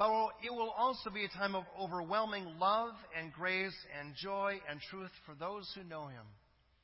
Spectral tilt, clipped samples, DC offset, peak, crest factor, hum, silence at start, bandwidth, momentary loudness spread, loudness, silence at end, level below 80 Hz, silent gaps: -7.5 dB/octave; under 0.1%; under 0.1%; -20 dBFS; 18 dB; none; 0 s; 5.8 kHz; 13 LU; -38 LUFS; 0.5 s; -72 dBFS; none